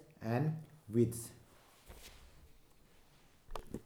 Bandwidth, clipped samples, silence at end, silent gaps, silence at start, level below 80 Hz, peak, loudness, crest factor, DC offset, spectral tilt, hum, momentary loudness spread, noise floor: 19 kHz; under 0.1%; 0 s; none; 0 s; -58 dBFS; -20 dBFS; -38 LUFS; 22 dB; under 0.1%; -7 dB/octave; none; 24 LU; -64 dBFS